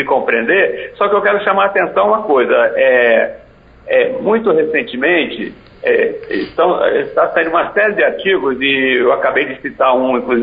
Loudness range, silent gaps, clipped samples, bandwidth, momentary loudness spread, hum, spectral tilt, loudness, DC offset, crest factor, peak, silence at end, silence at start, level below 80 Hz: 2 LU; none; under 0.1%; 5.2 kHz; 6 LU; none; -1.5 dB/octave; -13 LUFS; under 0.1%; 14 dB; 0 dBFS; 0 s; 0 s; -50 dBFS